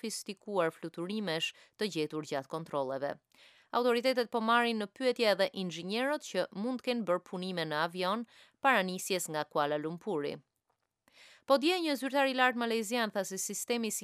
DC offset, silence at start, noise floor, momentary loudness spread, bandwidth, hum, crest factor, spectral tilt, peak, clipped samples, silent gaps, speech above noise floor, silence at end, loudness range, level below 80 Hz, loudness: under 0.1%; 0.05 s; -82 dBFS; 10 LU; 15.5 kHz; none; 22 dB; -3.5 dB/octave; -12 dBFS; under 0.1%; none; 49 dB; 0 s; 3 LU; -88 dBFS; -33 LUFS